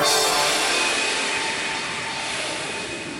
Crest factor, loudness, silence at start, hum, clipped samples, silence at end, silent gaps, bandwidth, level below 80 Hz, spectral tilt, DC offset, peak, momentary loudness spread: 16 dB; -21 LUFS; 0 s; none; under 0.1%; 0 s; none; 17 kHz; -58 dBFS; -0.5 dB/octave; under 0.1%; -6 dBFS; 8 LU